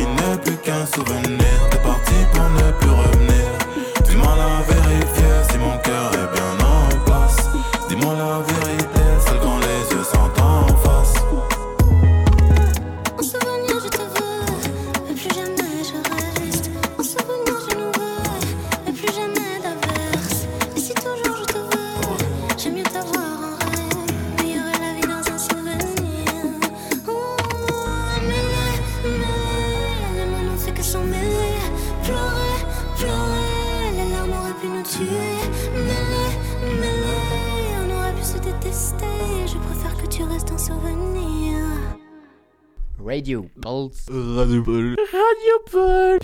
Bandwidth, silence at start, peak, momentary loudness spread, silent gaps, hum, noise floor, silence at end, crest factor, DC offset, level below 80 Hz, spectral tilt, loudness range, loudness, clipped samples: 18.5 kHz; 0 s; -6 dBFS; 9 LU; none; none; -54 dBFS; 0 s; 12 dB; under 0.1%; -22 dBFS; -5 dB/octave; 7 LU; -20 LUFS; under 0.1%